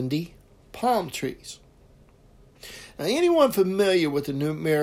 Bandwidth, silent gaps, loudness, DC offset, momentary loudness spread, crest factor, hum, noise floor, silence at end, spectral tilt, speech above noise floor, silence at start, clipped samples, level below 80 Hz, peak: 16 kHz; none; -24 LUFS; under 0.1%; 22 LU; 18 dB; none; -54 dBFS; 0 s; -5.5 dB/octave; 31 dB; 0 s; under 0.1%; -56 dBFS; -8 dBFS